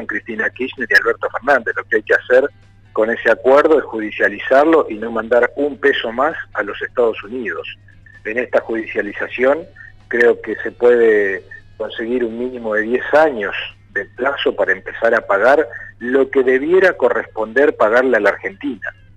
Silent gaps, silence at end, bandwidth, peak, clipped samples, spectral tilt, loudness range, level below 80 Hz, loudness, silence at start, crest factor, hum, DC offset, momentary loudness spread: none; 0.25 s; 9.6 kHz; -2 dBFS; under 0.1%; -5.5 dB/octave; 5 LU; -50 dBFS; -16 LUFS; 0 s; 14 dB; none; under 0.1%; 12 LU